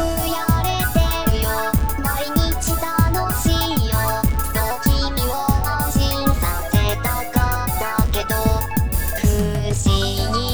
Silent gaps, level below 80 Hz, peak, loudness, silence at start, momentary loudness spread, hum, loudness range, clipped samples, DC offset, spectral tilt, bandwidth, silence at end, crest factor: none; -24 dBFS; -4 dBFS; -20 LUFS; 0 s; 2 LU; none; 1 LU; under 0.1%; 2%; -5 dB/octave; over 20 kHz; 0 s; 14 dB